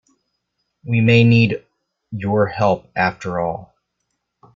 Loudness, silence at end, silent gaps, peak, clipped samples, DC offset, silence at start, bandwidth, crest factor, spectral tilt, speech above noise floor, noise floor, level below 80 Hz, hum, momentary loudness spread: -17 LUFS; 0.9 s; none; -2 dBFS; under 0.1%; under 0.1%; 0.85 s; 7.4 kHz; 16 dB; -8 dB/octave; 58 dB; -74 dBFS; -52 dBFS; 60 Hz at -45 dBFS; 17 LU